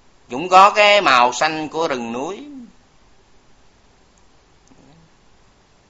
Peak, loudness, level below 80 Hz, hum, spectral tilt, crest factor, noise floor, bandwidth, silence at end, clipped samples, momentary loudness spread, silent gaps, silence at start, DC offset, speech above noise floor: 0 dBFS; -14 LUFS; -58 dBFS; none; -2.5 dB/octave; 20 dB; -53 dBFS; 8.2 kHz; 3.25 s; under 0.1%; 20 LU; none; 0.3 s; under 0.1%; 38 dB